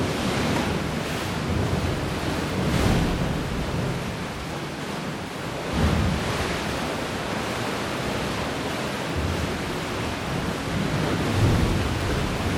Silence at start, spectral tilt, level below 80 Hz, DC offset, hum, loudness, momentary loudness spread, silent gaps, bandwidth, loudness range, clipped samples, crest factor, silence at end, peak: 0 s; -5.5 dB/octave; -36 dBFS; under 0.1%; none; -26 LUFS; 8 LU; none; 17.5 kHz; 2 LU; under 0.1%; 16 dB; 0 s; -8 dBFS